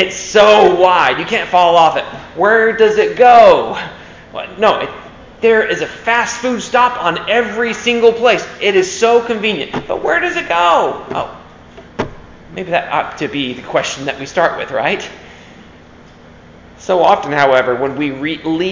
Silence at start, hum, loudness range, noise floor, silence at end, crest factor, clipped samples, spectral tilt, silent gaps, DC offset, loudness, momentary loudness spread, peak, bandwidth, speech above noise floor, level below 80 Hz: 0 s; none; 9 LU; -40 dBFS; 0 s; 14 dB; 0.2%; -3.5 dB/octave; none; under 0.1%; -13 LUFS; 16 LU; 0 dBFS; 7.6 kHz; 27 dB; -46 dBFS